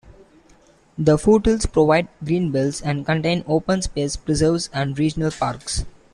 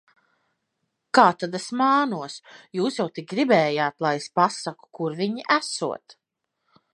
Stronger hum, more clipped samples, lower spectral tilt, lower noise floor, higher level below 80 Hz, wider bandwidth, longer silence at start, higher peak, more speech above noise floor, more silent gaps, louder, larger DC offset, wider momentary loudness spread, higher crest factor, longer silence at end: neither; neither; about the same, -5.5 dB/octave vs -4.5 dB/octave; second, -53 dBFS vs -80 dBFS; first, -36 dBFS vs -78 dBFS; about the same, 11.5 kHz vs 11.5 kHz; second, 0.05 s vs 1.15 s; about the same, -4 dBFS vs -2 dBFS; second, 34 dB vs 57 dB; neither; first, -20 LUFS vs -23 LUFS; neither; second, 8 LU vs 14 LU; second, 18 dB vs 24 dB; second, 0.25 s vs 0.8 s